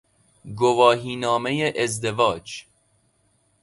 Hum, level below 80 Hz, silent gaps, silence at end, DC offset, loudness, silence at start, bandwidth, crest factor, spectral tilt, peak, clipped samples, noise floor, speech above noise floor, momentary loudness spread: none; -58 dBFS; none; 1 s; under 0.1%; -21 LUFS; 0.45 s; 11.5 kHz; 22 dB; -4.5 dB/octave; -2 dBFS; under 0.1%; -65 dBFS; 44 dB; 18 LU